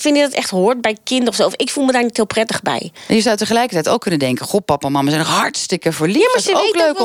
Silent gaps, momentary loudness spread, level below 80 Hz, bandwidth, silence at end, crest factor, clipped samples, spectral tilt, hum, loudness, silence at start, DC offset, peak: none; 5 LU; -56 dBFS; 18.5 kHz; 0 s; 14 dB; under 0.1%; -4 dB/octave; none; -16 LUFS; 0 s; under 0.1%; -2 dBFS